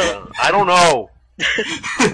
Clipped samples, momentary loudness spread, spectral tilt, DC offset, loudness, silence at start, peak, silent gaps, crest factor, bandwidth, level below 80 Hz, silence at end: under 0.1%; 9 LU; -2.5 dB/octave; under 0.1%; -16 LUFS; 0 s; -2 dBFS; none; 14 dB; 10.5 kHz; -46 dBFS; 0 s